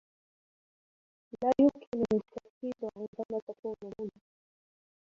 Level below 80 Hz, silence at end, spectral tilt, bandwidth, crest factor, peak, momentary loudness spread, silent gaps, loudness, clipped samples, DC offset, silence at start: -68 dBFS; 1.05 s; -8 dB/octave; 7.4 kHz; 20 dB; -14 dBFS; 17 LU; 1.87-1.92 s, 2.50-2.61 s, 3.08-3.13 s, 3.25-3.29 s, 3.42-3.47 s, 3.59-3.63 s; -33 LUFS; under 0.1%; under 0.1%; 1.4 s